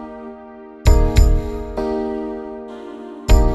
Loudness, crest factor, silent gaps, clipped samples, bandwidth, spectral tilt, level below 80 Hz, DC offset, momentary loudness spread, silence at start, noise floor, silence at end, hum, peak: -20 LUFS; 16 dB; none; under 0.1%; 12.5 kHz; -6.5 dB/octave; -18 dBFS; under 0.1%; 19 LU; 0 s; -38 dBFS; 0 s; none; -2 dBFS